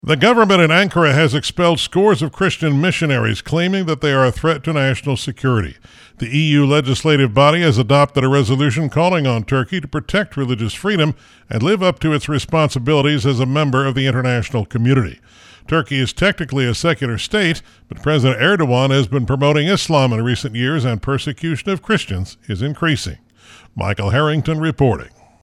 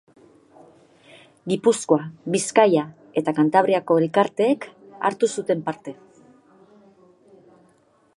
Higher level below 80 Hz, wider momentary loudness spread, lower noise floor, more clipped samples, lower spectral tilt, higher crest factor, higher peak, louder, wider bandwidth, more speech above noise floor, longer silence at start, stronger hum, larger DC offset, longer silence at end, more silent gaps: first, -42 dBFS vs -74 dBFS; second, 8 LU vs 11 LU; second, -45 dBFS vs -60 dBFS; neither; about the same, -6 dB/octave vs -5 dB/octave; second, 16 dB vs 22 dB; about the same, 0 dBFS vs -2 dBFS; first, -16 LUFS vs -21 LUFS; about the same, 12.5 kHz vs 11.5 kHz; second, 30 dB vs 40 dB; second, 0.05 s vs 1.45 s; neither; neither; second, 0.35 s vs 2.25 s; neither